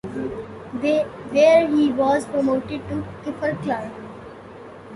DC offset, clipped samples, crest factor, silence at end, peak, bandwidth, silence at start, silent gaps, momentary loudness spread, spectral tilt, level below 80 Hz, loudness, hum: under 0.1%; under 0.1%; 18 dB; 0 s; -4 dBFS; 11.5 kHz; 0.05 s; none; 23 LU; -6 dB/octave; -52 dBFS; -21 LUFS; none